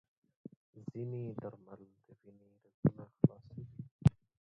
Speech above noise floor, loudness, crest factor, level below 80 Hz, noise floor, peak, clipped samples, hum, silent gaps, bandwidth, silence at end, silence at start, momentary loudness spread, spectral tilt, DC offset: 10 dB; -36 LUFS; 26 dB; -56 dBFS; -51 dBFS; -12 dBFS; under 0.1%; none; 2.74-2.83 s, 3.91-3.99 s; 7.2 kHz; 0.4 s; 0.75 s; 24 LU; -10.5 dB/octave; under 0.1%